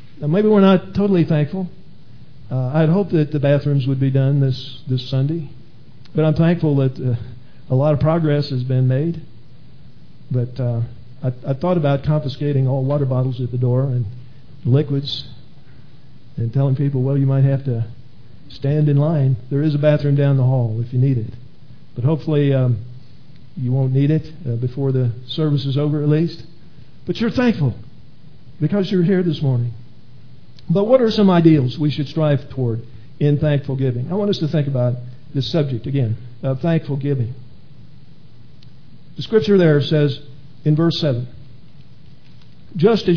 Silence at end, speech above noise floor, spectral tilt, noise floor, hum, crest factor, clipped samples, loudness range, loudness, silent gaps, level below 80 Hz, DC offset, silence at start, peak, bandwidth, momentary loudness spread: 0 s; 29 dB; -9.5 dB/octave; -46 dBFS; none; 18 dB; under 0.1%; 5 LU; -18 LUFS; none; -50 dBFS; 2%; 0.15 s; 0 dBFS; 5.4 kHz; 12 LU